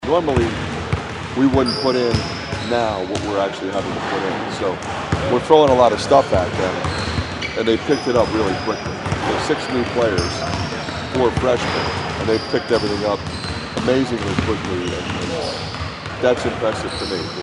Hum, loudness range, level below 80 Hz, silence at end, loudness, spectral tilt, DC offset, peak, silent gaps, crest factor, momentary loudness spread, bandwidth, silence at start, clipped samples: none; 5 LU; -38 dBFS; 0 s; -20 LUFS; -5.5 dB/octave; under 0.1%; 0 dBFS; none; 20 dB; 9 LU; 11.5 kHz; 0 s; under 0.1%